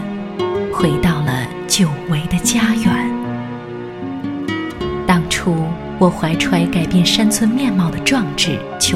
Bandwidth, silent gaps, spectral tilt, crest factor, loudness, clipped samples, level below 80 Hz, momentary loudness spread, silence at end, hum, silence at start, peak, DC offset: 16 kHz; none; -4.5 dB/octave; 16 dB; -17 LUFS; under 0.1%; -38 dBFS; 10 LU; 0 s; none; 0 s; 0 dBFS; under 0.1%